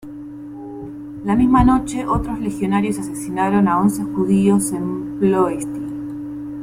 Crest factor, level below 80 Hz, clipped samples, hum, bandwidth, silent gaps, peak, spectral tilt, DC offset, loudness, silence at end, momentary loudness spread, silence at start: 16 dB; -36 dBFS; under 0.1%; none; 16 kHz; none; -2 dBFS; -7 dB/octave; under 0.1%; -19 LUFS; 0 s; 17 LU; 0 s